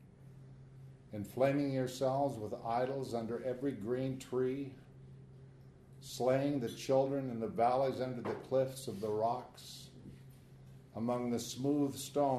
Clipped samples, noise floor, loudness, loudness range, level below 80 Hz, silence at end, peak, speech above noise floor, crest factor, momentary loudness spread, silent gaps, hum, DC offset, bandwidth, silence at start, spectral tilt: under 0.1%; -57 dBFS; -36 LUFS; 5 LU; -68 dBFS; 0 s; -18 dBFS; 22 dB; 18 dB; 23 LU; none; none; under 0.1%; 13.5 kHz; 0 s; -6 dB/octave